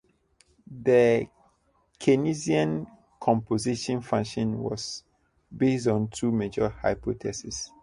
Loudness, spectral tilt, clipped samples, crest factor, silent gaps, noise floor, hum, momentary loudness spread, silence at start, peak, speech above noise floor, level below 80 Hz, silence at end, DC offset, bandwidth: -27 LUFS; -6 dB/octave; under 0.1%; 20 dB; none; -67 dBFS; none; 11 LU; 0.7 s; -8 dBFS; 42 dB; -54 dBFS; 0.15 s; under 0.1%; 11.5 kHz